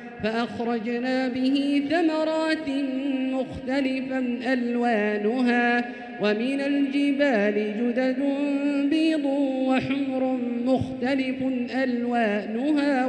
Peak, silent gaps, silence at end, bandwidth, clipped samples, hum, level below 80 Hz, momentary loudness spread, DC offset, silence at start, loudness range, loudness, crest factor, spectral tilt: -10 dBFS; none; 0 s; 9.2 kHz; under 0.1%; none; -60 dBFS; 5 LU; under 0.1%; 0 s; 2 LU; -25 LUFS; 14 dB; -6 dB/octave